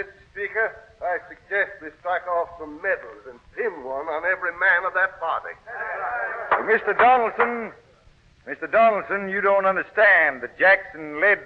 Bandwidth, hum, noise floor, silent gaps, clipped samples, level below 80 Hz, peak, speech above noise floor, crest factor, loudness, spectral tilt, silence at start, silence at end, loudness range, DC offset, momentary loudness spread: 6.2 kHz; none; -55 dBFS; none; under 0.1%; -60 dBFS; -6 dBFS; 32 dB; 16 dB; -22 LUFS; -6 dB/octave; 0 s; 0 s; 7 LU; under 0.1%; 15 LU